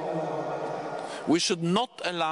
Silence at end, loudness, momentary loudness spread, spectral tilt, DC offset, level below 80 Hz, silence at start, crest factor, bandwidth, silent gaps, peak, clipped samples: 0 s; -28 LUFS; 9 LU; -4 dB/octave; under 0.1%; -72 dBFS; 0 s; 16 dB; 11 kHz; none; -12 dBFS; under 0.1%